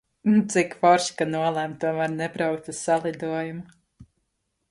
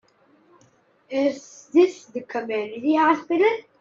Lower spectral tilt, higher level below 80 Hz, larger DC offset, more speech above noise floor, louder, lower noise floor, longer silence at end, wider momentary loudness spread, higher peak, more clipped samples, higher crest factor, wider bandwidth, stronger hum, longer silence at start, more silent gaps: about the same, -5 dB/octave vs -4.5 dB/octave; first, -66 dBFS vs -76 dBFS; neither; first, 52 dB vs 38 dB; about the same, -24 LUFS vs -22 LUFS; first, -76 dBFS vs -60 dBFS; first, 0.65 s vs 0.2 s; about the same, 10 LU vs 11 LU; about the same, -6 dBFS vs -4 dBFS; neither; about the same, 18 dB vs 18 dB; first, 11.5 kHz vs 7.6 kHz; neither; second, 0.25 s vs 1.1 s; neither